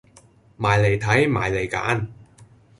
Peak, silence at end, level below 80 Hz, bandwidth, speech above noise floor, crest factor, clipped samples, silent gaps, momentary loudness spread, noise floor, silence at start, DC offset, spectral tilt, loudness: -4 dBFS; 0.35 s; -46 dBFS; 11.5 kHz; 33 dB; 18 dB; under 0.1%; none; 7 LU; -53 dBFS; 0.6 s; under 0.1%; -6 dB/octave; -21 LUFS